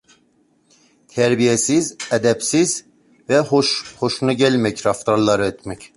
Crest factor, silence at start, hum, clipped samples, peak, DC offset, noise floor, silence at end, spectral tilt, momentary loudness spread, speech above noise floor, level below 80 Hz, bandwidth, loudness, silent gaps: 16 dB; 1.15 s; none; under 0.1%; -2 dBFS; under 0.1%; -60 dBFS; 0.1 s; -4 dB/octave; 7 LU; 42 dB; -54 dBFS; 11.5 kHz; -18 LUFS; none